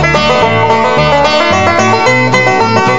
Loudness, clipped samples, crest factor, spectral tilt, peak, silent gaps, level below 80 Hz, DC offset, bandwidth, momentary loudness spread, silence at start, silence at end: -8 LUFS; 0.7%; 8 dB; -4.5 dB/octave; 0 dBFS; none; -32 dBFS; 4%; 11 kHz; 1 LU; 0 s; 0 s